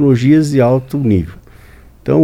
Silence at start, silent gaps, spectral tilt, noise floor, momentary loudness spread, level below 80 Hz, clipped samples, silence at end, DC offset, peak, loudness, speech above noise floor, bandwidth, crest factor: 0 s; none; -8.5 dB/octave; -40 dBFS; 12 LU; -38 dBFS; under 0.1%; 0 s; under 0.1%; 0 dBFS; -13 LUFS; 29 dB; 15.5 kHz; 12 dB